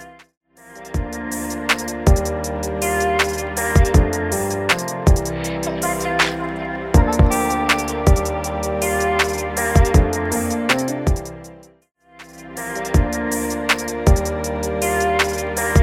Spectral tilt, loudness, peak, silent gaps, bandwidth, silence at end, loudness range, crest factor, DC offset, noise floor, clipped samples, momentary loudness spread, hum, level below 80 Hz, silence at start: -5 dB/octave; -19 LUFS; -2 dBFS; 0.37-0.41 s; 17 kHz; 0 s; 4 LU; 18 dB; under 0.1%; -42 dBFS; under 0.1%; 9 LU; none; -24 dBFS; 0 s